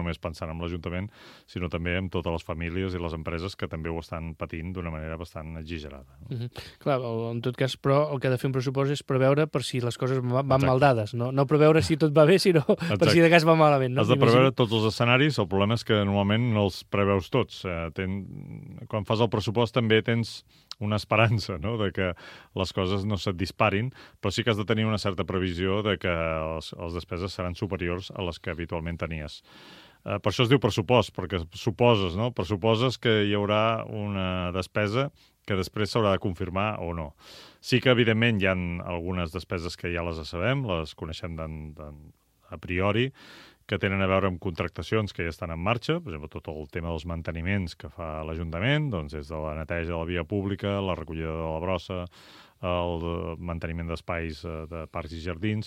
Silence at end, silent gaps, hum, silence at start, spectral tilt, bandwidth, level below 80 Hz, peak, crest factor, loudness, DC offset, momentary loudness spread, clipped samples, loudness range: 0 s; none; none; 0 s; -6.5 dB/octave; 15 kHz; -48 dBFS; -2 dBFS; 24 dB; -27 LUFS; under 0.1%; 15 LU; under 0.1%; 11 LU